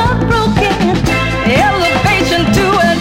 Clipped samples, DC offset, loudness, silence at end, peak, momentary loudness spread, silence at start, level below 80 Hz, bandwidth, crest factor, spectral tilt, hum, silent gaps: under 0.1%; under 0.1%; -11 LUFS; 0 s; 0 dBFS; 2 LU; 0 s; -24 dBFS; 16.5 kHz; 12 dB; -5.5 dB/octave; none; none